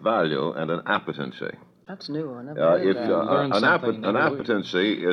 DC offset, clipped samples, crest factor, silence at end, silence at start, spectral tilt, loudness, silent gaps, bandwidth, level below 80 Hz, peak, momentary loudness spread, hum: under 0.1%; under 0.1%; 16 dB; 0 s; 0 s; -6.5 dB/octave; -24 LUFS; none; 10 kHz; -68 dBFS; -8 dBFS; 13 LU; none